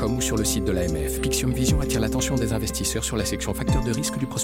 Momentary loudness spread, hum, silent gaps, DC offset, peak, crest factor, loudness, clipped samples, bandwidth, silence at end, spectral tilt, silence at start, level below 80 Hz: 3 LU; none; none; under 0.1%; -10 dBFS; 14 dB; -24 LUFS; under 0.1%; 16.5 kHz; 0 s; -4.5 dB/octave; 0 s; -32 dBFS